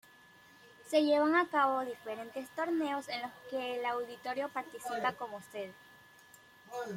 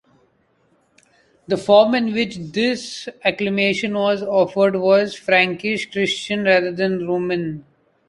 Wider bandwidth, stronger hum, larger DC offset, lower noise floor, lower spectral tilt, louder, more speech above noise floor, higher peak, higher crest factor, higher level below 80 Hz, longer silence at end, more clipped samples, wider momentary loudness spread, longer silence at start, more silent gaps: first, 16.5 kHz vs 11.5 kHz; neither; neither; about the same, -60 dBFS vs -61 dBFS; about the same, -4 dB/octave vs -5 dB/octave; second, -34 LUFS vs -19 LUFS; second, 26 dB vs 43 dB; second, -16 dBFS vs -2 dBFS; about the same, 18 dB vs 18 dB; second, -82 dBFS vs -60 dBFS; second, 0 s vs 0.5 s; neither; first, 15 LU vs 9 LU; second, 0.65 s vs 1.5 s; neither